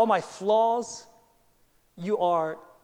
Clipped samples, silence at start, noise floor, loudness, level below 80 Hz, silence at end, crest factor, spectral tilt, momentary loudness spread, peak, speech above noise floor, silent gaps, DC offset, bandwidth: under 0.1%; 0 s; -64 dBFS; -26 LUFS; -72 dBFS; 0.25 s; 16 dB; -5 dB/octave; 15 LU; -10 dBFS; 38 dB; none; under 0.1%; 11.5 kHz